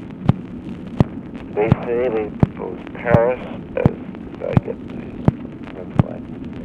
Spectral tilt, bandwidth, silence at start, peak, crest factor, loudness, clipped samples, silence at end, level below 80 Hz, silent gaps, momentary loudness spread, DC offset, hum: -10 dB/octave; 6 kHz; 0 s; 0 dBFS; 20 dB; -21 LUFS; under 0.1%; 0 s; -38 dBFS; none; 14 LU; under 0.1%; none